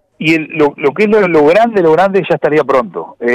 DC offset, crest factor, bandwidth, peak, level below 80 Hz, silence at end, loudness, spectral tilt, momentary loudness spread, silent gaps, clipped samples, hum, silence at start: under 0.1%; 8 dB; 10.5 kHz; -2 dBFS; -48 dBFS; 0 s; -11 LUFS; -7 dB/octave; 6 LU; none; under 0.1%; none; 0.2 s